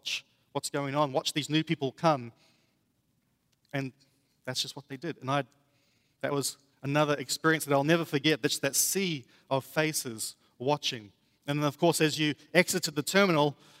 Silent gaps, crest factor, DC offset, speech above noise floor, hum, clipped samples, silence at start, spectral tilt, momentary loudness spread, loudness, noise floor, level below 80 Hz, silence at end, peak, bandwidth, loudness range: none; 24 dB; under 0.1%; 45 dB; none; under 0.1%; 0.05 s; -4 dB/octave; 12 LU; -29 LUFS; -74 dBFS; -76 dBFS; 0.25 s; -6 dBFS; 16 kHz; 9 LU